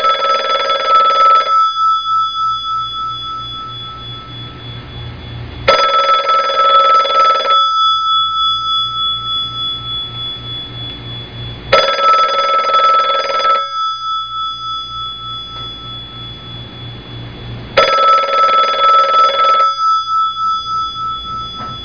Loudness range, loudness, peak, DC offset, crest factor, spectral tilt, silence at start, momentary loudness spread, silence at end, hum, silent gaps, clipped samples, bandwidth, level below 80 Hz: 9 LU; -12 LUFS; 0 dBFS; 0.4%; 14 dB; -3 dB/octave; 0 s; 18 LU; 0 s; none; none; under 0.1%; 5.2 kHz; -42 dBFS